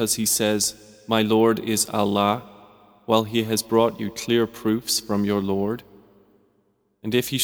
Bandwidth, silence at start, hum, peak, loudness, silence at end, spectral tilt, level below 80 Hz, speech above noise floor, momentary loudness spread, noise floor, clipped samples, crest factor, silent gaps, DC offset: over 20 kHz; 0 s; none; -2 dBFS; -22 LUFS; 0 s; -4 dB/octave; -60 dBFS; 45 dB; 9 LU; -66 dBFS; under 0.1%; 20 dB; none; under 0.1%